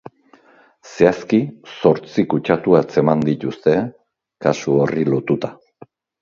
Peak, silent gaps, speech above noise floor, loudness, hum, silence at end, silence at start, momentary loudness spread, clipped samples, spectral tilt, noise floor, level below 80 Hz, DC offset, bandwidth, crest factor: 0 dBFS; none; 35 dB; -18 LUFS; none; 0.7 s; 0.85 s; 7 LU; under 0.1%; -7.5 dB/octave; -52 dBFS; -56 dBFS; under 0.1%; 7.4 kHz; 18 dB